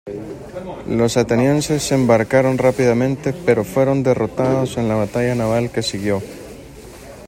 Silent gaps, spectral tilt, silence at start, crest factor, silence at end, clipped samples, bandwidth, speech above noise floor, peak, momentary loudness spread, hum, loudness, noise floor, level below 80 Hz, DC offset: none; -6 dB/octave; 0.05 s; 16 dB; 0 s; under 0.1%; 16.5 kHz; 20 dB; -2 dBFS; 17 LU; none; -17 LUFS; -37 dBFS; -44 dBFS; under 0.1%